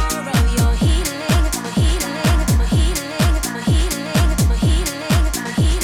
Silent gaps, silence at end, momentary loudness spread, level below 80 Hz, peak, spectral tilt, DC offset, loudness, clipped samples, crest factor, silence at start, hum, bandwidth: none; 0 s; 3 LU; -20 dBFS; -4 dBFS; -5 dB/octave; under 0.1%; -18 LUFS; under 0.1%; 12 dB; 0 s; none; 17 kHz